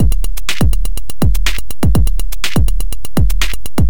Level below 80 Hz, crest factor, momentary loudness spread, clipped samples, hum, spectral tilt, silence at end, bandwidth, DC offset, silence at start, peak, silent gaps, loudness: -16 dBFS; 12 dB; 5 LU; under 0.1%; none; -5 dB/octave; 0 s; 17.5 kHz; 30%; 0 s; 0 dBFS; none; -18 LUFS